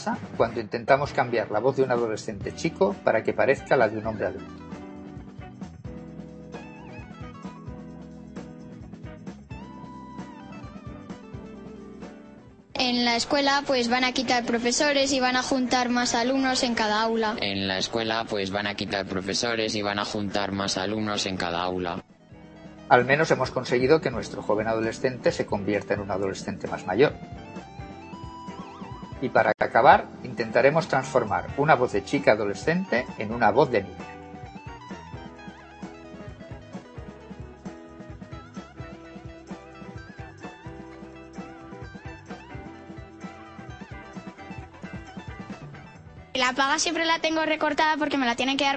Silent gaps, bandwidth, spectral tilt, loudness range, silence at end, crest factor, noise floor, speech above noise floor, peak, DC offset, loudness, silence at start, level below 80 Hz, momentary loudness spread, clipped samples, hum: none; 8.8 kHz; -4 dB/octave; 19 LU; 0 s; 24 dB; -49 dBFS; 24 dB; -2 dBFS; under 0.1%; -24 LUFS; 0 s; -52 dBFS; 20 LU; under 0.1%; none